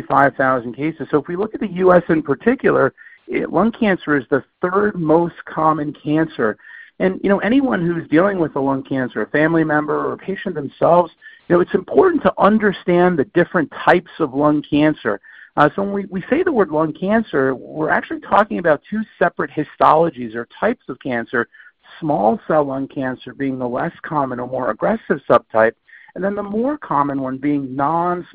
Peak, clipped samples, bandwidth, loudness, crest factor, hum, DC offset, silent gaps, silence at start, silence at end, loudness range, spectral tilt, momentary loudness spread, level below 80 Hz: 0 dBFS; under 0.1%; 4.9 kHz; -18 LUFS; 18 dB; none; under 0.1%; none; 0 s; 0.1 s; 4 LU; -9.5 dB/octave; 9 LU; -52 dBFS